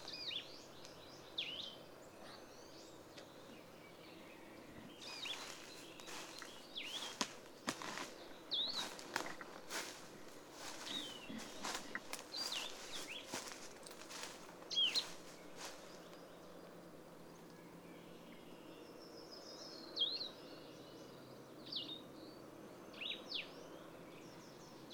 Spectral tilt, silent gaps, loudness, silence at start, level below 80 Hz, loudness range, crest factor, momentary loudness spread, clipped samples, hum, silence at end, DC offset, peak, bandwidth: -1.5 dB/octave; none; -46 LUFS; 0 s; -78 dBFS; 13 LU; 30 dB; 16 LU; under 0.1%; none; 0 s; under 0.1%; -20 dBFS; over 20 kHz